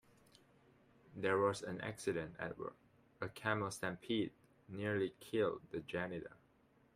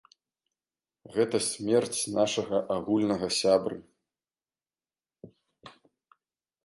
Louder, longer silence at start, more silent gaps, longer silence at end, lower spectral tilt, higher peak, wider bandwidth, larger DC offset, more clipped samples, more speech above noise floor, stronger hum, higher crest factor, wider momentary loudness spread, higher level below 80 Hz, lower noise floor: second, -41 LUFS vs -28 LUFS; about the same, 1.1 s vs 1.1 s; neither; second, 0.6 s vs 0.95 s; first, -5.5 dB/octave vs -4 dB/octave; second, -20 dBFS vs -10 dBFS; first, 15.5 kHz vs 11.5 kHz; neither; neither; second, 31 dB vs over 63 dB; neither; about the same, 22 dB vs 20 dB; first, 12 LU vs 5 LU; second, -74 dBFS vs -66 dBFS; second, -72 dBFS vs under -90 dBFS